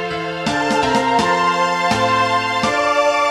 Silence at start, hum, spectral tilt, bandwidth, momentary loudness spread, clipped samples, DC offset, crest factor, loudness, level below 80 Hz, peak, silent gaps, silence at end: 0 s; none; -4 dB/octave; 16 kHz; 4 LU; under 0.1%; 0.1%; 14 dB; -16 LUFS; -48 dBFS; -2 dBFS; none; 0 s